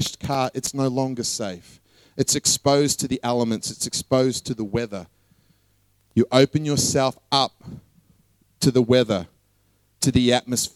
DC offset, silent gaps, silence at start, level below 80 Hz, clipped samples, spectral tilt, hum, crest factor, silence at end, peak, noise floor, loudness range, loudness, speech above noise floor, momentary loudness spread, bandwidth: under 0.1%; none; 0 s; -50 dBFS; under 0.1%; -4 dB/octave; none; 22 dB; 0.05 s; -2 dBFS; -64 dBFS; 2 LU; -22 LUFS; 42 dB; 10 LU; 16 kHz